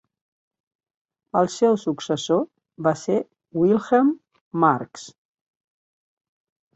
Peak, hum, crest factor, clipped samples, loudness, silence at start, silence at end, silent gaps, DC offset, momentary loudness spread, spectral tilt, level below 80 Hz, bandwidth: -4 dBFS; none; 20 dB; under 0.1%; -22 LUFS; 1.35 s; 1.65 s; 4.41-4.51 s; under 0.1%; 13 LU; -6 dB/octave; -66 dBFS; 8.2 kHz